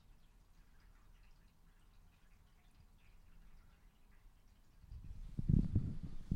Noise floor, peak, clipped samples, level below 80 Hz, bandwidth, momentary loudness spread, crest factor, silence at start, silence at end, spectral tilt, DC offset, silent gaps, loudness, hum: -65 dBFS; -18 dBFS; under 0.1%; -50 dBFS; 9.4 kHz; 21 LU; 26 dB; 0.1 s; 0 s; -9.5 dB/octave; under 0.1%; none; -40 LUFS; none